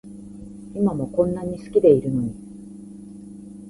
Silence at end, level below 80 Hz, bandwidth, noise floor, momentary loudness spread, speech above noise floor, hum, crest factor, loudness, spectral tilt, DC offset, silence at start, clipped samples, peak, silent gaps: 0 s; -50 dBFS; 11.5 kHz; -40 dBFS; 23 LU; 19 dB; none; 20 dB; -21 LUFS; -9.5 dB/octave; under 0.1%; 0.05 s; under 0.1%; -2 dBFS; none